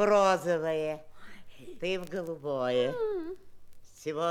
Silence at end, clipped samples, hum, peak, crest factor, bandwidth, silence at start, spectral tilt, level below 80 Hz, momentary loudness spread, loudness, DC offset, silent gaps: 0 s; under 0.1%; none; -12 dBFS; 18 dB; 16 kHz; 0 s; -5 dB/octave; -60 dBFS; 17 LU; -31 LUFS; under 0.1%; none